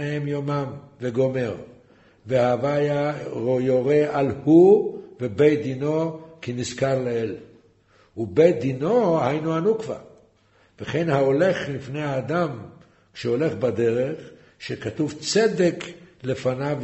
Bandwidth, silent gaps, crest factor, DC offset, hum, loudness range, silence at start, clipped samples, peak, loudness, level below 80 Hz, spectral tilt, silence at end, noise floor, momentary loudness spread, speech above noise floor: 8.2 kHz; none; 18 dB; under 0.1%; none; 5 LU; 0 s; under 0.1%; -4 dBFS; -22 LUFS; -60 dBFS; -6.5 dB/octave; 0 s; -59 dBFS; 14 LU; 38 dB